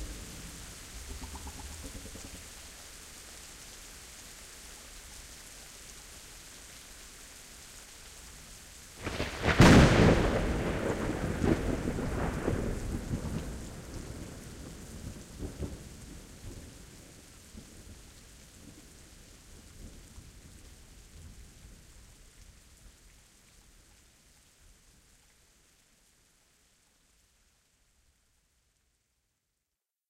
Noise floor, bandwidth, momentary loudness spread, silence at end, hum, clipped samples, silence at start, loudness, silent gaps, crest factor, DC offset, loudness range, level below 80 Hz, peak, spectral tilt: -88 dBFS; 16 kHz; 22 LU; 7.65 s; none; under 0.1%; 0 s; -30 LUFS; none; 26 dB; under 0.1%; 27 LU; -44 dBFS; -8 dBFS; -5.5 dB/octave